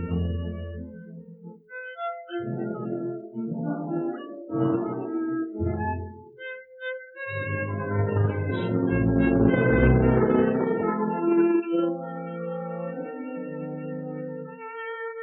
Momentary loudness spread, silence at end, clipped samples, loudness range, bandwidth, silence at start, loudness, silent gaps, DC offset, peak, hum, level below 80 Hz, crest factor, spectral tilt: 17 LU; 0 s; under 0.1%; 11 LU; 4.2 kHz; 0 s; -27 LUFS; none; under 0.1%; -8 dBFS; none; -40 dBFS; 18 dB; -12 dB/octave